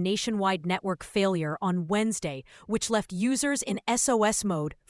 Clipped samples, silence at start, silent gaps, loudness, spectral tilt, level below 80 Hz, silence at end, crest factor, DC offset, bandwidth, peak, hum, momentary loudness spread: under 0.1%; 0 s; none; -27 LUFS; -4 dB/octave; -58 dBFS; 0.15 s; 16 dB; under 0.1%; 12 kHz; -12 dBFS; none; 6 LU